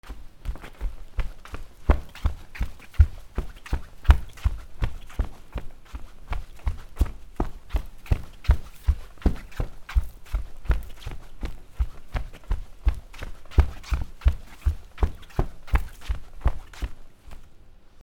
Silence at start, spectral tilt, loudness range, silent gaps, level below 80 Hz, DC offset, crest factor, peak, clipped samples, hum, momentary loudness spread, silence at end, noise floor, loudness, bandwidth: 0.05 s; -7 dB/octave; 6 LU; none; -28 dBFS; under 0.1%; 26 dB; 0 dBFS; under 0.1%; none; 15 LU; 0 s; -46 dBFS; -30 LUFS; 16 kHz